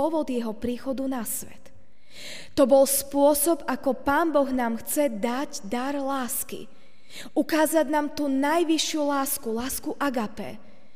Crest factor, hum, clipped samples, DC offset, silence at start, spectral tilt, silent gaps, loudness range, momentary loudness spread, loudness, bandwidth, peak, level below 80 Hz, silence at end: 18 dB; none; under 0.1%; 1%; 0 s; -3 dB/octave; none; 4 LU; 14 LU; -25 LUFS; 16 kHz; -8 dBFS; -56 dBFS; 0.4 s